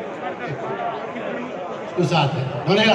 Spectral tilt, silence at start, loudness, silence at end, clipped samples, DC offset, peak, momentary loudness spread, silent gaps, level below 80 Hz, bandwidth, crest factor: -6 dB/octave; 0 s; -24 LUFS; 0 s; under 0.1%; under 0.1%; -2 dBFS; 10 LU; none; -62 dBFS; 10.5 kHz; 20 dB